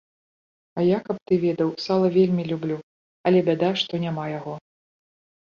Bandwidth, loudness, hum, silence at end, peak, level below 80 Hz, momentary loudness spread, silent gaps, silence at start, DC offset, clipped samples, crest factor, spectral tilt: 7 kHz; -23 LUFS; none; 1 s; -8 dBFS; -64 dBFS; 13 LU; 1.22-1.26 s, 2.83-3.24 s; 0.75 s; under 0.1%; under 0.1%; 16 dB; -7.5 dB/octave